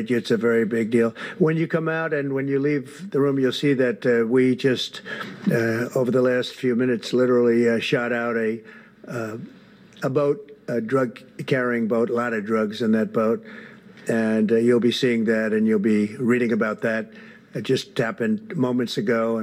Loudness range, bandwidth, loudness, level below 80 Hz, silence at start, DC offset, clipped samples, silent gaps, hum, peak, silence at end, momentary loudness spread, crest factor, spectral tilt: 4 LU; 15.5 kHz; -22 LUFS; -74 dBFS; 0 s; under 0.1%; under 0.1%; none; none; -6 dBFS; 0 s; 10 LU; 16 dB; -6.5 dB/octave